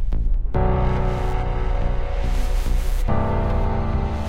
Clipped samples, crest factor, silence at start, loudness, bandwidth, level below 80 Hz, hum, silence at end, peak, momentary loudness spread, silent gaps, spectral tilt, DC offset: under 0.1%; 12 dB; 0 s; -24 LUFS; 10.5 kHz; -20 dBFS; none; 0 s; -8 dBFS; 4 LU; none; -7.5 dB/octave; under 0.1%